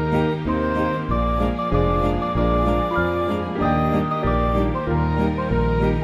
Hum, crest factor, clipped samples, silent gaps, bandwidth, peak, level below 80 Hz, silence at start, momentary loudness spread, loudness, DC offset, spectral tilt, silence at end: none; 14 dB; under 0.1%; none; 12.5 kHz; -6 dBFS; -28 dBFS; 0 s; 3 LU; -21 LUFS; under 0.1%; -9 dB/octave; 0 s